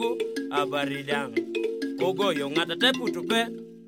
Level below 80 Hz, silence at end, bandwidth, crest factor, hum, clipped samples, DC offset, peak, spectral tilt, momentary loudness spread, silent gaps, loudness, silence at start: -76 dBFS; 0 s; 16.5 kHz; 18 dB; none; under 0.1%; under 0.1%; -8 dBFS; -4 dB/octave; 7 LU; none; -27 LUFS; 0 s